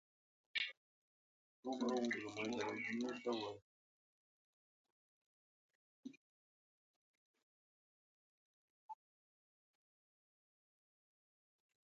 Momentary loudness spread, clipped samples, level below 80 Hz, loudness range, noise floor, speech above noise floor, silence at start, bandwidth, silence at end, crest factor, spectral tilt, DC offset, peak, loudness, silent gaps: 18 LU; under 0.1%; under -90 dBFS; 24 LU; under -90 dBFS; over 47 dB; 0.55 s; 7.4 kHz; 2.95 s; 24 dB; -2 dB/octave; under 0.1%; -26 dBFS; -43 LUFS; 0.77-1.63 s, 3.62-4.85 s, 4.92-5.69 s, 5.75-6.03 s, 6.17-7.34 s, 7.43-8.89 s